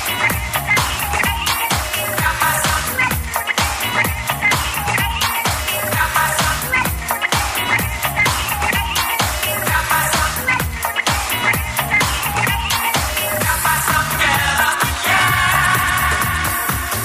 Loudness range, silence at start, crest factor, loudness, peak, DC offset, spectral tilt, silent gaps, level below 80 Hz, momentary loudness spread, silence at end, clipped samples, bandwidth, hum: 2 LU; 0 s; 16 dB; -16 LUFS; 0 dBFS; under 0.1%; -2.5 dB/octave; none; -30 dBFS; 4 LU; 0 s; under 0.1%; 15.5 kHz; none